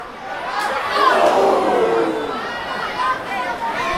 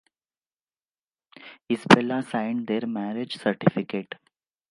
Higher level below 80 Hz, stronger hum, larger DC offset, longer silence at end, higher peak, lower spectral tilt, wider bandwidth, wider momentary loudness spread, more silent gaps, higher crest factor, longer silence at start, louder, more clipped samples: first, -50 dBFS vs -68 dBFS; neither; neither; second, 0 s vs 0.65 s; about the same, -4 dBFS vs -2 dBFS; second, -3.5 dB/octave vs -6 dB/octave; first, 16.5 kHz vs 11.5 kHz; second, 10 LU vs 14 LU; neither; second, 16 dB vs 26 dB; second, 0 s vs 1.4 s; first, -18 LUFS vs -24 LUFS; neither